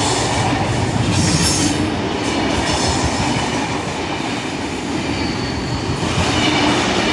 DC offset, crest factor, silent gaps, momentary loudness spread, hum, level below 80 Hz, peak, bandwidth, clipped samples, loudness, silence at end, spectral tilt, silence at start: under 0.1%; 16 dB; none; 7 LU; none; -34 dBFS; -2 dBFS; 11.5 kHz; under 0.1%; -18 LUFS; 0 s; -4 dB/octave; 0 s